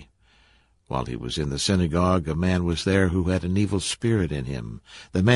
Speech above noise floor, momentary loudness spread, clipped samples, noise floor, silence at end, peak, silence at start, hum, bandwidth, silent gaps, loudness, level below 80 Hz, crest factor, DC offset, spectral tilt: 37 dB; 10 LU; under 0.1%; -60 dBFS; 0 s; -6 dBFS; 0 s; none; 11.5 kHz; none; -24 LUFS; -36 dBFS; 18 dB; under 0.1%; -5.5 dB/octave